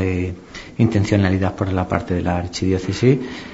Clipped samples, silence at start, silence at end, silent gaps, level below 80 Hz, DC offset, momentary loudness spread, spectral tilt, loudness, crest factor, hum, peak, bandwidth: under 0.1%; 0 s; 0 s; none; -42 dBFS; 0.2%; 7 LU; -7 dB/octave; -20 LUFS; 20 dB; none; 0 dBFS; 8 kHz